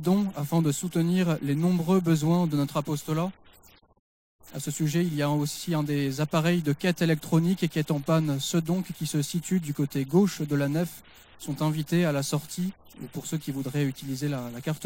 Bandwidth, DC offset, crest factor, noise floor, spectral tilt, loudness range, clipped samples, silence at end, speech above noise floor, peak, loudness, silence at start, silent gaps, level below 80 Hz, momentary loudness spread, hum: 16.5 kHz; under 0.1%; 16 dB; -56 dBFS; -6 dB/octave; 4 LU; under 0.1%; 0 s; 30 dB; -10 dBFS; -27 LUFS; 0 s; 3.99-4.39 s; -60 dBFS; 9 LU; none